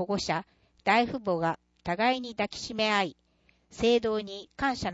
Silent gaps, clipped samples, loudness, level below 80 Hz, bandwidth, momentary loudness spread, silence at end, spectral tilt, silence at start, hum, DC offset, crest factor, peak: none; under 0.1%; -29 LUFS; -56 dBFS; 8 kHz; 9 LU; 0 s; -4.5 dB/octave; 0 s; none; under 0.1%; 18 dB; -12 dBFS